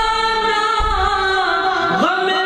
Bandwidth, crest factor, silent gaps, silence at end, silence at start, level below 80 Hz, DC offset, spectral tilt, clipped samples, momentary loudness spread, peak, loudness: 14 kHz; 14 dB; none; 0 s; 0 s; -30 dBFS; under 0.1%; -3.5 dB/octave; under 0.1%; 1 LU; -4 dBFS; -16 LUFS